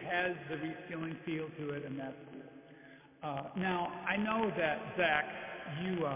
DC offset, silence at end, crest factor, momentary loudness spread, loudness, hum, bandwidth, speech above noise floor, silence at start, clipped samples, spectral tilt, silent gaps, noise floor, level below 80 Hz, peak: under 0.1%; 0 s; 24 dB; 19 LU; -37 LUFS; none; 3.8 kHz; 21 dB; 0 s; under 0.1%; -3.5 dB/octave; none; -57 dBFS; -68 dBFS; -14 dBFS